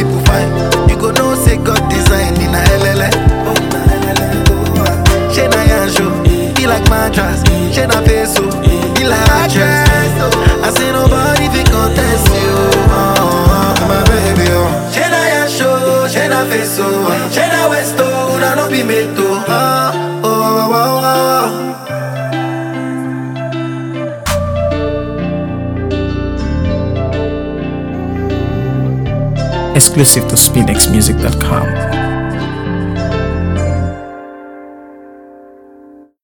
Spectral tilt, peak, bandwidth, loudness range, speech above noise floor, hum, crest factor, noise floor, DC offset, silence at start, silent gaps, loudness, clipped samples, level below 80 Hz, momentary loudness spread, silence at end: -4.5 dB/octave; 0 dBFS; over 20 kHz; 8 LU; 29 dB; none; 12 dB; -39 dBFS; under 0.1%; 0 s; none; -12 LUFS; 0.2%; -20 dBFS; 9 LU; 0.8 s